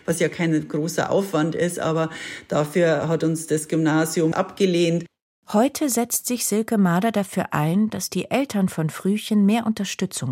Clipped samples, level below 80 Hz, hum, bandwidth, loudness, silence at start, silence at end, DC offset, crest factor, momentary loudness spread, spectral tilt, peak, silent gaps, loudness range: under 0.1%; -64 dBFS; none; 16.5 kHz; -22 LUFS; 0.1 s; 0 s; under 0.1%; 18 dB; 5 LU; -5 dB/octave; -4 dBFS; 5.22-5.43 s; 1 LU